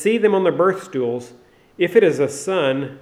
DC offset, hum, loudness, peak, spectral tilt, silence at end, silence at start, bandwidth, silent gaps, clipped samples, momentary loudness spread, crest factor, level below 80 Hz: under 0.1%; none; -18 LUFS; -2 dBFS; -5.5 dB/octave; 0.05 s; 0 s; 14.5 kHz; none; under 0.1%; 8 LU; 18 dB; -66 dBFS